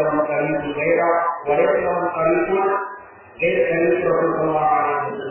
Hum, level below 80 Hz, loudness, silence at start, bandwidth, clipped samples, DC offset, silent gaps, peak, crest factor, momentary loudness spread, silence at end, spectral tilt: none; -54 dBFS; -19 LUFS; 0 s; 3.2 kHz; under 0.1%; under 0.1%; none; -6 dBFS; 14 dB; 5 LU; 0 s; -10 dB/octave